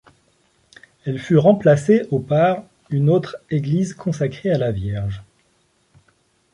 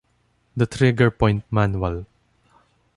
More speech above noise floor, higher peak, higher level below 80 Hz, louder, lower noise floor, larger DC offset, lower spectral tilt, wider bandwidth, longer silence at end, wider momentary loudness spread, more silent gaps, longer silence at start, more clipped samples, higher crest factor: about the same, 44 dB vs 45 dB; about the same, -2 dBFS vs -4 dBFS; second, -48 dBFS vs -40 dBFS; about the same, -19 LUFS vs -21 LUFS; about the same, -62 dBFS vs -65 dBFS; neither; about the same, -8 dB/octave vs -7.5 dB/octave; about the same, 11 kHz vs 11.5 kHz; first, 1.3 s vs 0.95 s; about the same, 13 LU vs 12 LU; neither; first, 1.05 s vs 0.55 s; neither; about the same, 18 dB vs 18 dB